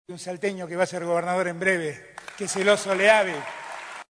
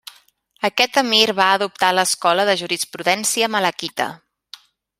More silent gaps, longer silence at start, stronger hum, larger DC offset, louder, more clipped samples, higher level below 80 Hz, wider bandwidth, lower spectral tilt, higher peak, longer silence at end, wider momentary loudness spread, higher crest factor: neither; second, 0.1 s vs 0.6 s; neither; neither; second, -24 LUFS vs -18 LUFS; neither; about the same, -70 dBFS vs -68 dBFS; second, 11 kHz vs 16 kHz; first, -3.5 dB/octave vs -1.5 dB/octave; second, -6 dBFS vs 0 dBFS; second, 0.05 s vs 0.85 s; first, 17 LU vs 10 LU; about the same, 20 dB vs 20 dB